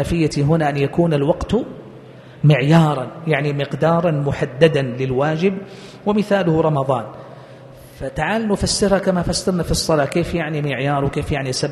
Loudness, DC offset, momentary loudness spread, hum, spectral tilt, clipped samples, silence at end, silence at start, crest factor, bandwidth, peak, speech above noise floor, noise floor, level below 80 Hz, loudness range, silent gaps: -18 LUFS; under 0.1%; 8 LU; none; -6 dB/octave; under 0.1%; 0 s; 0 s; 18 dB; 12.5 kHz; 0 dBFS; 22 dB; -40 dBFS; -38 dBFS; 3 LU; none